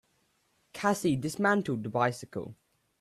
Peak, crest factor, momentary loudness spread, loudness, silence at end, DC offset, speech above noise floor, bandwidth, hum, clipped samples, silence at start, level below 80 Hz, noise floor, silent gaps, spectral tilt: -12 dBFS; 20 dB; 14 LU; -30 LUFS; 0.45 s; under 0.1%; 43 dB; 14.5 kHz; none; under 0.1%; 0.75 s; -66 dBFS; -72 dBFS; none; -5.5 dB/octave